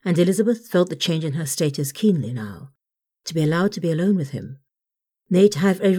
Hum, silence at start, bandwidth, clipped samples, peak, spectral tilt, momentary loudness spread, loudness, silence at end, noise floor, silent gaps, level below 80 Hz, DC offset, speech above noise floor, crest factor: none; 0.05 s; 17.5 kHz; under 0.1%; -4 dBFS; -6 dB/octave; 15 LU; -21 LUFS; 0 s; -87 dBFS; none; -66 dBFS; under 0.1%; 67 dB; 18 dB